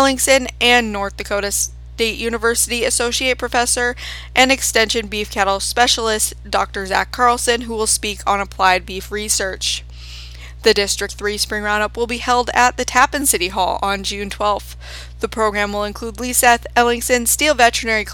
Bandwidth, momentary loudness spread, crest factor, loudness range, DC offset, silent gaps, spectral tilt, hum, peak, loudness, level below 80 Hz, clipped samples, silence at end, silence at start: over 20 kHz; 10 LU; 18 dB; 3 LU; under 0.1%; none; -1.5 dB/octave; none; 0 dBFS; -17 LUFS; -34 dBFS; under 0.1%; 0 s; 0 s